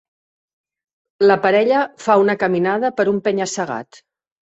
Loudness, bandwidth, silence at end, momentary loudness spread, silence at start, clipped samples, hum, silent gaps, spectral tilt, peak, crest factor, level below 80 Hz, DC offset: -17 LUFS; 8.2 kHz; 0.6 s; 8 LU; 1.2 s; under 0.1%; none; none; -5 dB/octave; -2 dBFS; 16 dB; -62 dBFS; under 0.1%